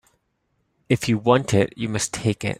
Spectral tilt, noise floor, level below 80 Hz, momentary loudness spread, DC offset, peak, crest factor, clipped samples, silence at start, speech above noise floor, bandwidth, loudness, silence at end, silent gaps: -5 dB/octave; -71 dBFS; -52 dBFS; 6 LU; under 0.1%; -2 dBFS; 22 dB; under 0.1%; 0.9 s; 50 dB; 14.5 kHz; -22 LUFS; 0.05 s; none